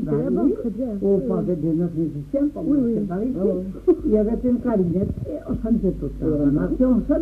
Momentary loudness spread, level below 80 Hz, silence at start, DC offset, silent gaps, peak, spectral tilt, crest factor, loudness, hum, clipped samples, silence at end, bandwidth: 6 LU; -36 dBFS; 0 s; under 0.1%; none; -6 dBFS; -11 dB/octave; 14 dB; -22 LUFS; none; under 0.1%; 0 s; 4.4 kHz